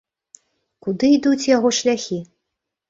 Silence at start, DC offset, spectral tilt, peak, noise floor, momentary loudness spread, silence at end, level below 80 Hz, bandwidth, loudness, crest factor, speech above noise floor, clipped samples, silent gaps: 0.85 s; under 0.1%; -4 dB/octave; -4 dBFS; -80 dBFS; 13 LU; 0.65 s; -62 dBFS; 7.8 kHz; -18 LUFS; 18 dB; 63 dB; under 0.1%; none